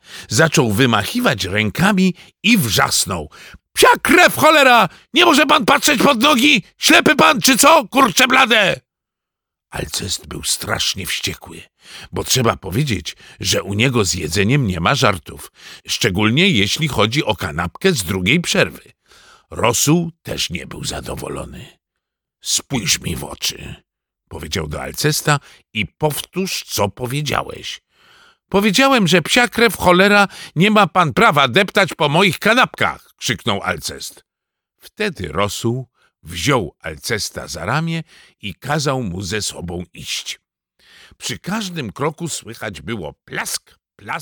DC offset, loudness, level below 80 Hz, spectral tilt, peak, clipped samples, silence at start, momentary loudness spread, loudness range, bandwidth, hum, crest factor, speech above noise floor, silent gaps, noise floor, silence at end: under 0.1%; -16 LUFS; -44 dBFS; -3.5 dB/octave; 0 dBFS; under 0.1%; 0.1 s; 17 LU; 11 LU; 19.5 kHz; none; 18 dB; 66 dB; none; -83 dBFS; 0 s